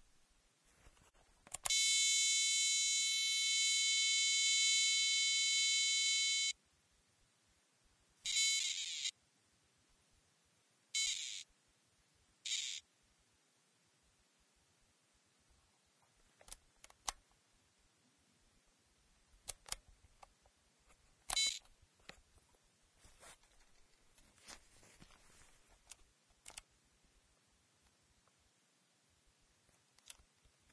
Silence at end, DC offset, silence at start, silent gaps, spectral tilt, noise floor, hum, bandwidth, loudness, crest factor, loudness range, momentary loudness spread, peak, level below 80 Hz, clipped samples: 4.2 s; under 0.1%; 1.5 s; none; 4 dB/octave; -76 dBFS; none; 11 kHz; -33 LUFS; 22 dB; 24 LU; 19 LU; -20 dBFS; -74 dBFS; under 0.1%